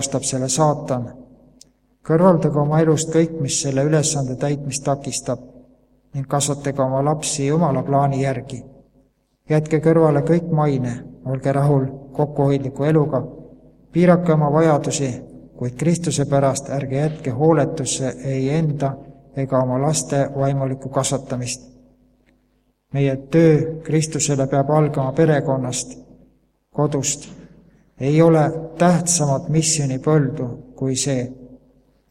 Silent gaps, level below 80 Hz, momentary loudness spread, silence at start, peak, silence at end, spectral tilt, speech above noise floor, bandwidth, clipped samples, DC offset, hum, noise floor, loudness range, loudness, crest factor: none; -50 dBFS; 12 LU; 0 s; 0 dBFS; 0.55 s; -5.5 dB/octave; 45 dB; 13 kHz; under 0.1%; under 0.1%; none; -64 dBFS; 4 LU; -19 LUFS; 20 dB